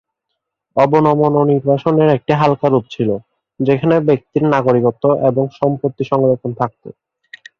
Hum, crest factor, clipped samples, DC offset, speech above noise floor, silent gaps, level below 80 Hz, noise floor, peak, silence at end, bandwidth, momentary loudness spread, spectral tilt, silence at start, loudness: none; 14 dB; under 0.1%; under 0.1%; 62 dB; none; -54 dBFS; -76 dBFS; 0 dBFS; 0.7 s; 7 kHz; 7 LU; -9 dB/octave; 0.75 s; -15 LUFS